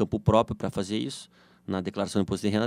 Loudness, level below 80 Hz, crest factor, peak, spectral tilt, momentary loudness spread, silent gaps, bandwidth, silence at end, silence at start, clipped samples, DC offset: -28 LUFS; -50 dBFS; 20 dB; -6 dBFS; -6.5 dB/octave; 12 LU; none; 14.5 kHz; 0 s; 0 s; under 0.1%; under 0.1%